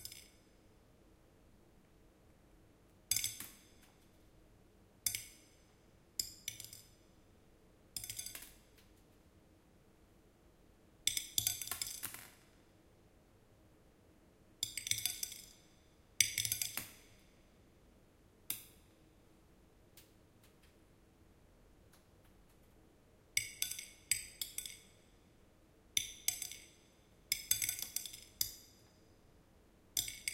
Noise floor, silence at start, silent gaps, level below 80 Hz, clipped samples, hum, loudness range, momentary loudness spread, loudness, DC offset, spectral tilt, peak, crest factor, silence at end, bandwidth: -66 dBFS; 0 s; none; -68 dBFS; under 0.1%; none; 12 LU; 22 LU; -39 LUFS; under 0.1%; 0.5 dB/octave; -10 dBFS; 38 dB; 0 s; 16.5 kHz